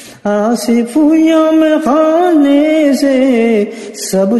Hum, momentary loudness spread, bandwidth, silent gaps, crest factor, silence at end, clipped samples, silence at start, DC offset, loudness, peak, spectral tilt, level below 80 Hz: none; 6 LU; 12.5 kHz; none; 10 dB; 0 s; under 0.1%; 0 s; under 0.1%; -10 LUFS; 0 dBFS; -5 dB/octave; -54 dBFS